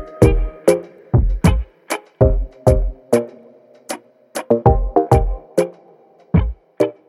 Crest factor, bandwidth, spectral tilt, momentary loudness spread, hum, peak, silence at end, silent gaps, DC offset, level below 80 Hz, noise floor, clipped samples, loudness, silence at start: 16 dB; 14.5 kHz; -7.5 dB/octave; 15 LU; none; 0 dBFS; 0.2 s; none; under 0.1%; -22 dBFS; -49 dBFS; under 0.1%; -18 LUFS; 0 s